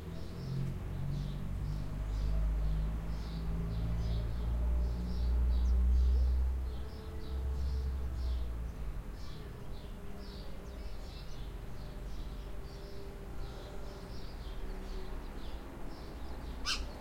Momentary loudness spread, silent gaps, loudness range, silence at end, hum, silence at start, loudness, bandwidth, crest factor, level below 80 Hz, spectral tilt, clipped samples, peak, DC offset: 14 LU; none; 12 LU; 0 s; none; 0 s; -39 LUFS; 10.5 kHz; 14 dB; -36 dBFS; -6 dB/octave; under 0.1%; -20 dBFS; under 0.1%